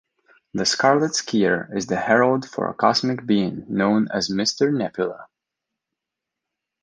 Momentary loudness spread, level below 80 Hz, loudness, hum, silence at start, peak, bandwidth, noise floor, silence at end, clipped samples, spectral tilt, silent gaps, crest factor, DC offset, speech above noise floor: 8 LU; -60 dBFS; -21 LUFS; none; 0.55 s; -2 dBFS; 10 kHz; -85 dBFS; 1.6 s; under 0.1%; -4 dB/octave; none; 20 dB; under 0.1%; 64 dB